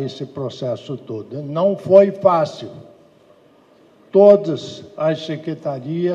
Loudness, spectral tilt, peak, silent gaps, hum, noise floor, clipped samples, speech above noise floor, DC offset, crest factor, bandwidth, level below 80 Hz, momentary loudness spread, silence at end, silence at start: -17 LUFS; -7.5 dB/octave; 0 dBFS; none; none; -51 dBFS; under 0.1%; 34 dB; under 0.1%; 18 dB; 7.6 kHz; -68 dBFS; 17 LU; 0 s; 0 s